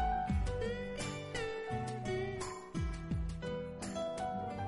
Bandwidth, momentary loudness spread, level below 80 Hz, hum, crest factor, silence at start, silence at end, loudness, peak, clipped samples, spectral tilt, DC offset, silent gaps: 11.5 kHz; 5 LU; -44 dBFS; none; 12 dB; 0 s; 0 s; -39 LUFS; -26 dBFS; under 0.1%; -5.5 dB/octave; under 0.1%; none